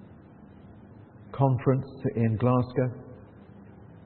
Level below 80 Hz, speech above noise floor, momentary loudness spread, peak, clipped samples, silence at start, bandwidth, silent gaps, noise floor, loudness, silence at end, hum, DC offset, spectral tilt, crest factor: -60 dBFS; 25 dB; 20 LU; -8 dBFS; under 0.1%; 0 s; 4.4 kHz; none; -50 dBFS; -27 LUFS; 0.05 s; none; under 0.1%; -13 dB/octave; 20 dB